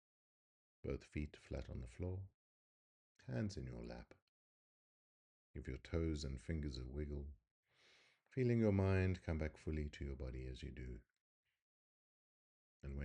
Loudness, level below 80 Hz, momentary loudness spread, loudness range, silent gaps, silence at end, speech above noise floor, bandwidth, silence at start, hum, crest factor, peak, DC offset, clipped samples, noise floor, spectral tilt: -45 LUFS; -56 dBFS; 17 LU; 10 LU; 2.34-3.15 s, 4.22-5.54 s, 7.51-7.63 s, 11.21-11.43 s, 11.62-12.80 s; 0 s; 30 dB; 9.6 kHz; 0.85 s; none; 22 dB; -24 dBFS; under 0.1%; under 0.1%; -73 dBFS; -7.5 dB/octave